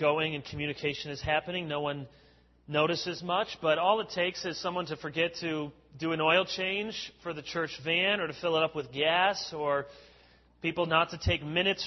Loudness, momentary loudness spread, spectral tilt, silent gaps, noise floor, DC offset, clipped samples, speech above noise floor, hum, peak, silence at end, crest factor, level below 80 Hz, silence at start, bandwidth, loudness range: -30 LUFS; 10 LU; -4.5 dB/octave; none; -61 dBFS; under 0.1%; under 0.1%; 30 dB; none; -10 dBFS; 0 s; 20 dB; -54 dBFS; 0 s; 6.2 kHz; 2 LU